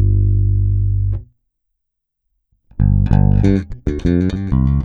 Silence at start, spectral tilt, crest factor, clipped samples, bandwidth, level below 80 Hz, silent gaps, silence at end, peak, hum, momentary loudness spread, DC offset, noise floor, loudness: 0 s; -10 dB/octave; 16 dB; under 0.1%; 6 kHz; -22 dBFS; none; 0 s; 0 dBFS; none; 9 LU; under 0.1%; -75 dBFS; -16 LUFS